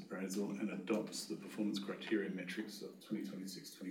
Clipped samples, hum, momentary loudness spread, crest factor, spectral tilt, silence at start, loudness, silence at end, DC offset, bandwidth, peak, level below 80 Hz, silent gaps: under 0.1%; none; 9 LU; 18 dB; -4.5 dB/octave; 0 s; -42 LUFS; 0 s; under 0.1%; 18 kHz; -24 dBFS; under -90 dBFS; none